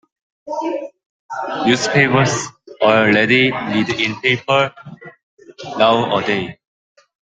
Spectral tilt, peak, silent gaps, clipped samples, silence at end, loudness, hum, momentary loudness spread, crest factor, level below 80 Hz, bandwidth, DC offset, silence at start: -4.5 dB/octave; 0 dBFS; 1.06-1.29 s, 5.23-5.37 s; under 0.1%; 0.75 s; -16 LUFS; none; 18 LU; 18 dB; -56 dBFS; 9.6 kHz; under 0.1%; 0.45 s